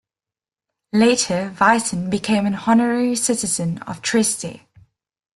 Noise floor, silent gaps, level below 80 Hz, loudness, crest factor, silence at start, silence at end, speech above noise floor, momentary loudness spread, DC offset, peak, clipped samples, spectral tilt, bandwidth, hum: under -90 dBFS; none; -56 dBFS; -19 LUFS; 18 dB; 0.95 s; 0.8 s; over 71 dB; 8 LU; under 0.1%; -2 dBFS; under 0.1%; -4 dB/octave; 12.5 kHz; none